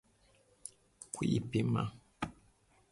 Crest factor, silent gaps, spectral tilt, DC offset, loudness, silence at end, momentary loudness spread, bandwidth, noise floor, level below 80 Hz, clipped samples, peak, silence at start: 20 dB; none; -6 dB/octave; under 0.1%; -37 LUFS; 0.6 s; 18 LU; 11.5 kHz; -69 dBFS; -62 dBFS; under 0.1%; -20 dBFS; 0.65 s